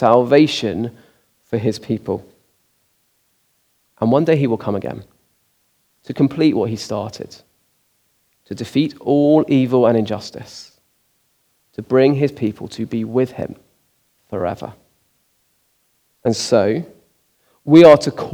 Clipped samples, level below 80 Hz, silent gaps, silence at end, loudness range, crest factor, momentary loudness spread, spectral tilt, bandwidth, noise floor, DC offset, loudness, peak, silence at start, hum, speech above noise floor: under 0.1%; -60 dBFS; none; 0 s; 8 LU; 18 dB; 20 LU; -6.5 dB/octave; 14 kHz; -63 dBFS; under 0.1%; -16 LUFS; 0 dBFS; 0 s; none; 47 dB